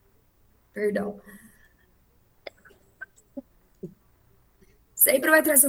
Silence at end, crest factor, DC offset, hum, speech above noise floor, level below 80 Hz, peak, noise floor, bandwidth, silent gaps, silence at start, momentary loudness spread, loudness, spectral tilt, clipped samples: 0 s; 24 dB; under 0.1%; none; 40 dB; -64 dBFS; -4 dBFS; -62 dBFS; over 20 kHz; none; 0.75 s; 28 LU; -21 LUFS; -2 dB/octave; under 0.1%